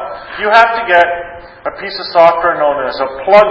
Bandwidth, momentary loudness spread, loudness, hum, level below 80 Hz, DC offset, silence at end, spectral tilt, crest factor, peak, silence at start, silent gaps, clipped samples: 8 kHz; 15 LU; -11 LUFS; none; -46 dBFS; under 0.1%; 0 s; -4.5 dB/octave; 12 dB; 0 dBFS; 0 s; none; 0.7%